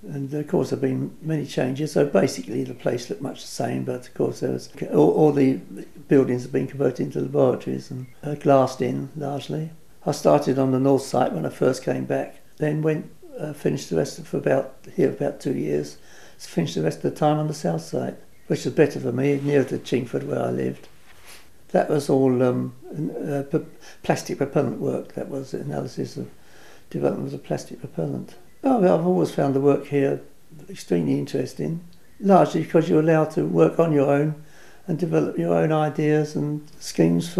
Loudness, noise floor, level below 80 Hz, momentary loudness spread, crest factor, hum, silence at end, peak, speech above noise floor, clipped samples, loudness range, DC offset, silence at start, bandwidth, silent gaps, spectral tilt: -23 LUFS; -50 dBFS; -60 dBFS; 13 LU; 20 dB; none; 0 s; -2 dBFS; 28 dB; under 0.1%; 5 LU; 0.5%; 0.05 s; 14.5 kHz; none; -7 dB/octave